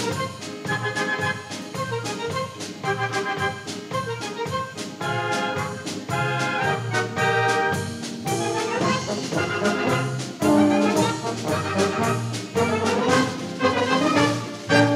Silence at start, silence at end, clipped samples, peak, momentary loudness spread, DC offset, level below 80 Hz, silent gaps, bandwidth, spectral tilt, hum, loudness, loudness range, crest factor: 0 s; 0 s; under 0.1%; -2 dBFS; 9 LU; under 0.1%; -60 dBFS; none; 16 kHz; -4.5 dB/octave; none; -24 LUFS; 5 LU; 22 dB